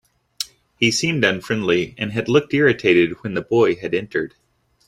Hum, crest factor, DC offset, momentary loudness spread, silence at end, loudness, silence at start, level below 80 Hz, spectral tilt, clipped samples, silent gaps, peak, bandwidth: none; 18 dB; under 0.1%; 14 LU; 0.6 s; -19 LUFS; 0.4 s; -56 dBFS; -4.5 dB/octave; under 0.1%; none; -2 dBFS; 15.5 kHz